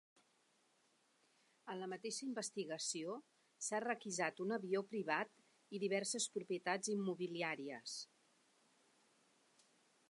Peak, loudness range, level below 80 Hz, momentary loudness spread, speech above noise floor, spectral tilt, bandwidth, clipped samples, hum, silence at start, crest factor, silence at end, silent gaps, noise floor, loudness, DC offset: -24 dBFS; 6 LU; under -90 dBFS; 9 LU; 35 dB; -3 dB/octave; 11.5 kHz; under 0.1%; none; 1.65 s; 22 dB; 2.05 s; none; -78 dBFS; -43 LUFS; under 0.1%